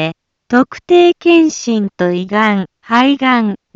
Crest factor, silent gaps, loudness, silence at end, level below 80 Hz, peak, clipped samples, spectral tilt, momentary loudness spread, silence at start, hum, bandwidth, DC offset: 12 dB; none; -12 LUFS; 0.2 s; -58 dBFS; 0 dBFS; under 0.1%; -5 dB/octave; 7 LU; 0 s; none; 7.6 kHz; under 0.1%